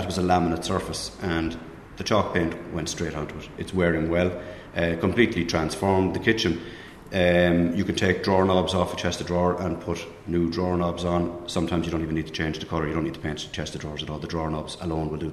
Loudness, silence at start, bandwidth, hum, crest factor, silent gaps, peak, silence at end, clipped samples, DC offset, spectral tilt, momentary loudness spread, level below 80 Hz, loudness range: -25 LUFS; 0 s; 13.5 kHz; none; 20 dB; none; -4 dBFS; 0 s; under 0.1%; under 0.1%; -5.5 dB/octave; 10 LU; -44 dBFS; 5 LU